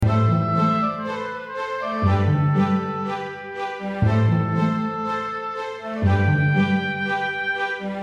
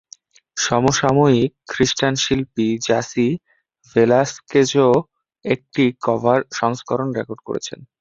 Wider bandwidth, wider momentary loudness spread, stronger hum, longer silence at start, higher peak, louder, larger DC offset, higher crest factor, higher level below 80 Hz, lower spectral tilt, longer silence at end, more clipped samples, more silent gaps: about the same, 7.4 kHz vs 7.8 kHz; about the same, 10 LU vs 12 LU; neither; second, 0 s vs 0.55 s; second, -8 dBFS vs -2 dBFS; second, -22 LUFS vs -19 LUFS; neither; about the same, 14 dB vs 18 dB; first, -46 dBFS vs -52 dBFS; first, -8 dB/octave vs -5 dB/octave; second, 0 s vs 0.15 s; neither; neither